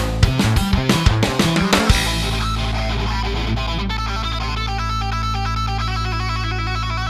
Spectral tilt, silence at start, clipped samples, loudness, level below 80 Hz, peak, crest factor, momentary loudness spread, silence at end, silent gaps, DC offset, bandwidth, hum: -5 dB/octave; 0 s; under 0.1%; -19 LUFS; -24 dBFS; 0 dBFS; 18 dB; 6 LU; 0 s; none; under 0.1%; 14 kHz; none